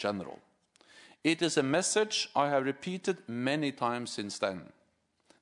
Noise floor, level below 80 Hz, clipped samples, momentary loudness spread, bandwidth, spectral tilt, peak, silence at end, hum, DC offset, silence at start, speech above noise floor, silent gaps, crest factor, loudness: -73 dBFS; -78 dBFS; under 0.1%; 8 LU; 11 kHz; -3.5 dB/octave; -14 dBFS; 0.75 s; none; under 0.1%; 0 s; 42 dB; none; 20 dB; -31 LUFS